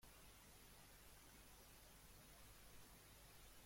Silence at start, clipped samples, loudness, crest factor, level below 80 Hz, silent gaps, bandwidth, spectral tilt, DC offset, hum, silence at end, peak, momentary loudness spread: 0 s; under 0.1%; -64 LUFS; 14 dB; -70 dBFS; none; 16.5 kHz; -2.5 dB/octave; under 0.1%; 50 Hz at -70 dBFS; 0 s; -52 dBFS; 1 LU